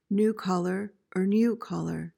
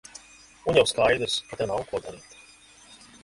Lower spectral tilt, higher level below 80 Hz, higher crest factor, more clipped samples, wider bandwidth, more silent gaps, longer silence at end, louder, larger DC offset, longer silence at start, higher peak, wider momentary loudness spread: first, -7.5 dB/octave vs -3.5 dB/octave; second, -66 dBFS vs -54 dBFS; second, 12 dB vs 22 dB; neither; first, 16 kHz vs 11.5 kHz; neither; second, 0.1 s vs 0.3 s; second, -28 LUFS vs -25 LUFS; neither; second, 0.1 s vs 0.65 s; second, -16 dBFS vs -6 dBFS; second, 9 LU vs 23 LU